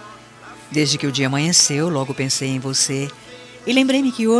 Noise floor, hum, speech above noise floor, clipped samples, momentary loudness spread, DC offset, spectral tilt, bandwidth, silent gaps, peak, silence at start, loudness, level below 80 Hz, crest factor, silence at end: -41 dBFS; none; 22 dB; under 0.1%; 14 LU; under 0.1%; -3.5 dB/octave; 13.5 kHz; none; -2 dBFS; 0 s; -18 LUFS; -62 dBFS; 18 dB; 0 s